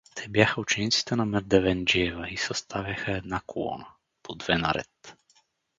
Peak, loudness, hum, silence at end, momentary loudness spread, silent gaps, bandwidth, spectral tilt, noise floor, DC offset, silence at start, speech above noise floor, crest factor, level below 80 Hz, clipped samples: -2 dBFS; -26 LUFS; none; 0.65 s; 12 LU; none; 9.4 kHz; -4 dB/octave; -66 dBFS; under 0.1%; 0.15 s; 39 dB; 26 dB; -50 dBFS; under 0.1%